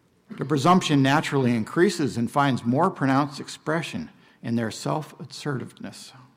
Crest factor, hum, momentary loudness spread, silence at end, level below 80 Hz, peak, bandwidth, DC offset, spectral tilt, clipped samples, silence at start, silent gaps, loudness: 16 dB; none; 19 LU; 0.2 s; -64 dBFS; -8 dBFS; 16 kHz; under 0.1%; -6 dB/octave; under 0.1%; 0.3 s; none; -24 LUFS